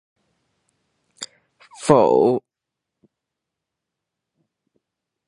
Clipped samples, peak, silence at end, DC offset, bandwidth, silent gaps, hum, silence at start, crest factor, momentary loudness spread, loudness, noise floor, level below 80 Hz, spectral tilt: under 0.1%; 0 dBFS; 2.9 s; under 0.1%; 11 kHz; none; none; 1.2 s; 24 dB; 22 LU; -17 LUFS; -84 dBFS; -66 dBFS; -6 dB/octave